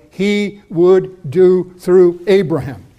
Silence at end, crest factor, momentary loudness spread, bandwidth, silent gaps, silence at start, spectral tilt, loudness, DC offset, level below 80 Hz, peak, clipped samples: 0.2 s; 12 dB; 9 LU; 10 kHz; none; 0.2 s; -7.5 dB/octave; -13 LUFS; under 0.1%; -52 dBFS; -2 dBFS; under 0.1%